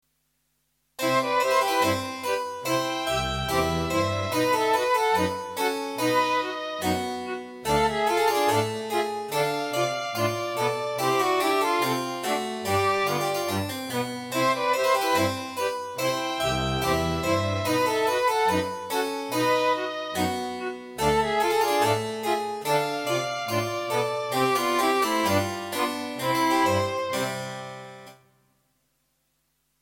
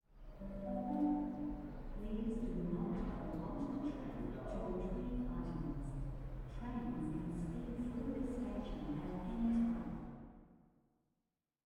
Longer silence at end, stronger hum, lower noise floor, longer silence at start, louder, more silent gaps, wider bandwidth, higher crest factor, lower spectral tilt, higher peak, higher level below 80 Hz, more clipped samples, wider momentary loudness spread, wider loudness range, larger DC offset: first, 1.65 s vs 1.1 s; neither; second, -73 dBFS vs -90 dBFS; first, 1 s vs 0.1 s; first, -25 LUFS vs -43 LUFS; neither; first, 17 kHz vs 10.5 kHz; about the same, 16 dB vs 14 dB; second, -4 dB/octave vs -9 dB/octave; first, -10 dBFS vs -28 dBFS; about the same, -50 dBFS vs -50 dBFS; neither; second, 7 LU vs 11 LU; about the same, 1 LU vs 2 LU; neither